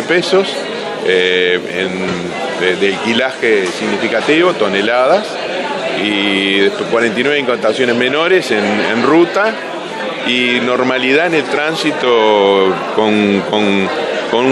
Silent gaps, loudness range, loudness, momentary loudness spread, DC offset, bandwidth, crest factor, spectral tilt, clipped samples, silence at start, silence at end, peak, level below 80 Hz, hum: none; 2 LU; -13 LUFS; 7 LU; under 0.1%; 12 kHz; 14 dB; -4.5 dB/octave; under 0.1%; 0 s; 0 s; 0 dBFS; -60 dBFS; none